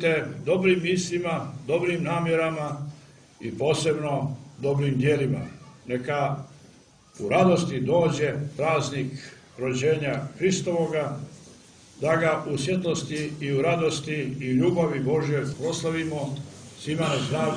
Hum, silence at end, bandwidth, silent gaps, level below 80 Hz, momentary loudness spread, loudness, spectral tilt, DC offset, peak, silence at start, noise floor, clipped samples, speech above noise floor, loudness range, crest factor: none; 0 s; 10.5 kHz; none; -58 dBFS; 12 LU; -26 LUFS; -5.5 dB/octave; under 0.1%; -8 dBFS; 0 s; -54 dBFS; under 0.1%; 29 dB; 2 LU; 18 dB